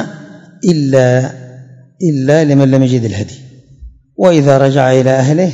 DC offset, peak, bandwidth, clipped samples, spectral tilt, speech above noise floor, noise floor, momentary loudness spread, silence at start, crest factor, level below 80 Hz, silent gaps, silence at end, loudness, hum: under 0.1%; 0 dBFS; 7.8 kHz; 0.9%; -7 dB/octave; 26 dB; -36 dBFS; 14 LU; 0 s; 12 dB; -46 dBFS; none; 0 s; -11 LUFS; none